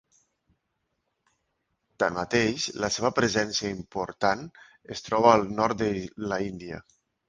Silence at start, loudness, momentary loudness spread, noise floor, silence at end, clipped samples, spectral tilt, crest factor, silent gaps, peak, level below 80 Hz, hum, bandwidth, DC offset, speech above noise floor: 2 s; -26 LUFS; 17 LU; -79 dBFS; 0.5 s; under 0.1%; -4 dB/octave; 24 dB; none; -4 dBFS; -56 dBFS; none; 10 kHz; under 0.1%; 52 dB